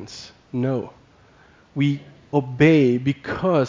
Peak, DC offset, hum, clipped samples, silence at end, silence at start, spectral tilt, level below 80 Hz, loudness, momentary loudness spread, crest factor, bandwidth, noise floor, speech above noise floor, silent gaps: -2 dBFS; under 0.1%; none; under 0.1%; 0 s; 0 s; -7.5 dB/octave; -54 dBFS; -21 LUFS; 20 LU; 18 dB; 7.6 kHz; -53 dBFS; 33 dB; none